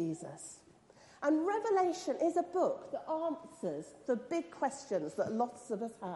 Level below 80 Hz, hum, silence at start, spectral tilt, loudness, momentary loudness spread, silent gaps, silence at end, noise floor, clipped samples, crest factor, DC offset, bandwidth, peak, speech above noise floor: -80 dBFS; none; 0 s; -5.5 dB/octave; -36 LUFS; 11 LU; none; 0 s; -61 dBFS; under 0.1%; 16 dB; under 0.1%; 11.5 kHz; -20 dBFS; 26 dB